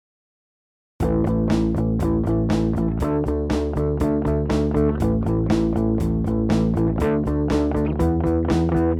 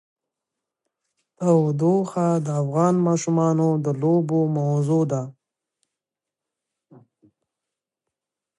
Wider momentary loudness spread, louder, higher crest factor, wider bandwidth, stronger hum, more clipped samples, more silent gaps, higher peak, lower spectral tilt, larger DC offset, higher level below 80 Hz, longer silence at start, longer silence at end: about the same, 2 LU vs 4 LU; about the same, -21 LUFS vs -21 LUFS; about the same, 14 dB vs 18 dB; first, 13.5 kHz vs 11 kHz; neither; neither; neither; about the same, -6 dBFS vs -6 dBFS; about the same, -8.5 dB/octave vs -8.5 dB/octave; neither; first, -30 dBFS vs -72 dBFS; second, 1 s vs 1.4 s; second, 0 s vs 3.3 s